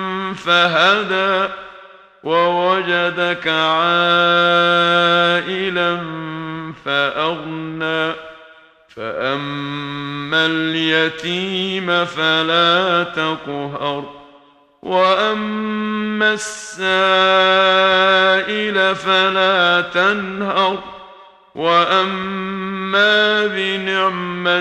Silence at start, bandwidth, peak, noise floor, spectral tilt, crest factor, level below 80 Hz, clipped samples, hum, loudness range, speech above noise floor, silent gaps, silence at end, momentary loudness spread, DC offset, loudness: 0 s; 11.5 kHz; 0 dBFS; -49 dBFS; -4 dB/octave; 16 dB; -58 dBFS; under 0.1%; none; 7 LU; 33 dB; none; 0 s; 13 LU; under 0.1%; -16 LUFS